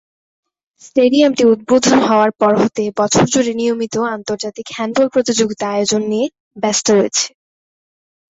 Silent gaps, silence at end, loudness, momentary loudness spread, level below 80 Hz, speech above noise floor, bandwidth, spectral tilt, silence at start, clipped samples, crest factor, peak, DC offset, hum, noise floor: 6.40-6.51 s; 1 s; -15 LUFS; 10 LU; -54 dBFS; over 76 dB; 8.2 kHz; -4 dB/octave; 0.95 s; under 0.1%; 14 dB; -2 dBFS; under 0.1%; none; under -90 dBFS